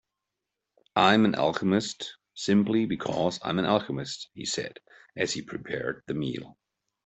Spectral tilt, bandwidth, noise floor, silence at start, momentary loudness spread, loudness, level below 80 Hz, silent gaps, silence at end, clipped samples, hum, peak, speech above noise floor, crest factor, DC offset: -5 dB/octave; 8.4 kHz; -86 dBFS; 0.95 s; 13 LU; -27 LUFS; -64 dBFS; none; 0.55 s; under 0.1%; none; -4 dBFS; 59 dB; 24 dB; under 0.1%